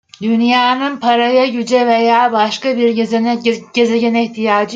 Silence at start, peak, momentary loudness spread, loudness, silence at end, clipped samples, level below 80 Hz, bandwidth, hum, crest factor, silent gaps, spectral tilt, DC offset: 0.2 s; -2 dBFS; 4 LU; -13 LUFS; 0 s; under 0.1%; -64 dBFS; 7.8 kHz; none; 12 dB; none; -4.5 dB/octave; under 0.1%